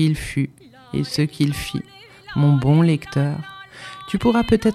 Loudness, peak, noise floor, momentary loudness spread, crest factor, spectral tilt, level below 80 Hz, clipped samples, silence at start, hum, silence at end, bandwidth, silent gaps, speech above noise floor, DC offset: -20 LUFS; -2 dBFS; -38 dBFS; 19 LU; 18 dB; -7 dB/octave; -42 dBFS; under 0.1%; 0 s; none; 0 s; 14 kHz; none; 19 dB; under 0.1%